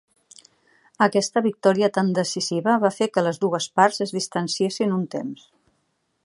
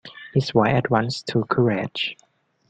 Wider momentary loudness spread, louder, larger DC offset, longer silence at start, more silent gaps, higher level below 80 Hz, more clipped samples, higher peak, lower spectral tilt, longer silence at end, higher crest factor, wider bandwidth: about the same, 7 LU vs 7 LU; about the same, -22 LUFS vs -22 LUFS; neither; first, 1 s vs 0.05 s; neither; second, -72 dBFS vs -56 dBFS; neither; about the same, -2 dBFS vs -4 dBFS; second, -4.5 dB/octave vs -6.5 dB/octave; first, 0.9 s vs 0.55 s; about the same, 20 dB vs 18 dB; first, 11.5 kHz vs 9.2 kHz